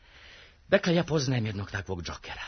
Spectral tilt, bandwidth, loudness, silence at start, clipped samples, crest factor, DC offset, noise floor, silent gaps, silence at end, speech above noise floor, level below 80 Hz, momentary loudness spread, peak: -5.5 dB/octave; 6.6 kHz; -29 LUFS; 0.15 s; under 0.1%; 22 dB; under 0.1%; -53 dBFS; none; 0 s; 24 dB; -52 dBFS; 12 LU; -8 dBFS